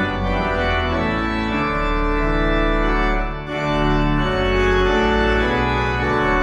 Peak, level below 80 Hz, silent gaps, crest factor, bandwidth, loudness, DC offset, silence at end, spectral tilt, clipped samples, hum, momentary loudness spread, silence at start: -6 dBFS; -24 dBFS; none; 12 dB; 8.6 kHz; -19 LUFS; under 0.1%; 0 s; -6.5 dB/octave; under 0.1%; none; 4 LU; 0 s